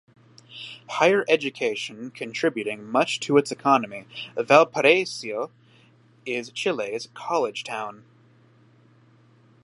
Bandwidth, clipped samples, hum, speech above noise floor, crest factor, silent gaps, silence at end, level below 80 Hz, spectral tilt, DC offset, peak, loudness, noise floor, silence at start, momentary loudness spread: 11.5 kHz; under 0.1%; none; 33 dB; 24 dB; none; 1.7 s; -78 dBFS; -4 dB/octave; under 0.1%; -2 dBFS; -23 LUFS; -56 dBFS; 0.5 s; 17 LU